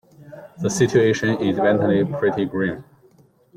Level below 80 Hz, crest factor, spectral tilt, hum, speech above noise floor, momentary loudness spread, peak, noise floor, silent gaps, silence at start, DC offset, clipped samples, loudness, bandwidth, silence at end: -56 dBFS; 18 dB; -6 dB/octave; none; 36 dB; 9 LU; -4 dBFS; -55 dBFS; none; 0.2 s; under 0.1%; under 0.1%; -20 LUFS; 15 kHz; 0.75 s